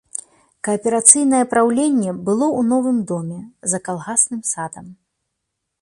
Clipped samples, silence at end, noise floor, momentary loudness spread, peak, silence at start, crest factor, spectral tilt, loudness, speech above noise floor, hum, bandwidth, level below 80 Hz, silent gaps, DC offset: under 0.1%; 0.9 s; -77 dBFS; 16 LU; 0 dBFS; 0.15 s; 20 dB; -4 dB/octave; -17 LUFS; 59 dB; none; 14 kHz; -62 dBFS; none; under 0.1%